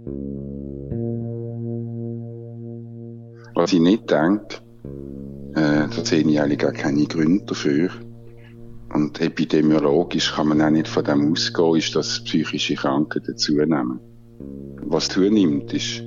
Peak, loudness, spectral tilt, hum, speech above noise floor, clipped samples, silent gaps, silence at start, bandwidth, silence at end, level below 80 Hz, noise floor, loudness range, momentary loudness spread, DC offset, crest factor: -4 dBFS; -21 LUFS; -5.5 dB/octave; none; 21 dB; under 0.1%; none; 0 s; 7.6 kHz; 0 s; -48 dBFS; -41 dBFS; 4 LU; 18 LU; under 0.1%; 16 dB